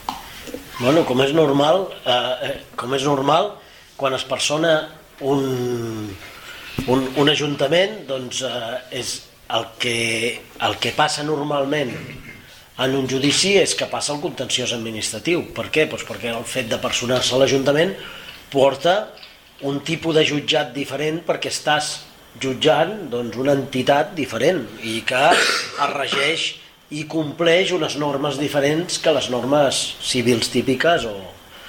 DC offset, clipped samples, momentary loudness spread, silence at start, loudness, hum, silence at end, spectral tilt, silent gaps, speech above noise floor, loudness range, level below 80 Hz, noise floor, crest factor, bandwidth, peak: under 0.1%; under 0.1%; 12 LU; 0 s; -20 LUFS; none; 0 s; -3.5 dB/octave; none; 22 dB; 3 LU; -52 dBFS; -42 dBFS; 18 dB; 18 kHz; -2 dBFS